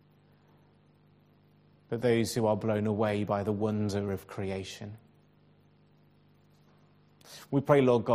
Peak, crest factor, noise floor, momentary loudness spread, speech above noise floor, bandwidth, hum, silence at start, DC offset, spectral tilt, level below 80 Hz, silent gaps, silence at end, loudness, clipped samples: -8 dBFS; 24 dB; -63 dBFS; 17 LU; 34 dB; 15.5 kHz; 50 Hz at -55 dBFS; 1.9 s; under 0.1%; -6.5 dB/octave; -68 dBFS; none; 0 s; -30 LUFS; under 0.1%